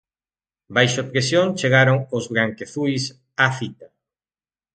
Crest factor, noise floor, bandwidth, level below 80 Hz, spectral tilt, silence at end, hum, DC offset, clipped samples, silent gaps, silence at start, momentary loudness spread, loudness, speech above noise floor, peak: 20 dB; under -90 dBFS; 9.2 kHz; -60 dBFS; -5 dB/octave; 0.9 s; none; under 0.1%; under 0.1%; none; 0.7 s; 10 LU; -20 LUFS; over 70 dB; 0 dBFS